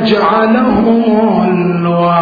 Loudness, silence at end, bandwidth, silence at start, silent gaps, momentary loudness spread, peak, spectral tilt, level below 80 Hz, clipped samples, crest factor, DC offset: -11 LUFS; 0 s; 5 kHz; 0 s; none; 3 LU; 0 dBFS; -9 dB/octave; -40 dBFS; under 0.1%; 10 dB; under 0.1%